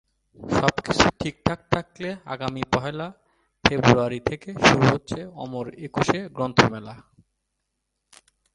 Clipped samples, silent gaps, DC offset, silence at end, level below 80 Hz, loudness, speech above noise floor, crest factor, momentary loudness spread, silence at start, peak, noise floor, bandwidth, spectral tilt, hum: under 0.1%; none; under 0.1%; 1.55 s; -46 dBFS; -23 LUFS; 55 dB; 24 dB; 15 LU; 0.4 s; 0 dBFS; -78 dBFS; 11 kHz; -5 dB/octave; none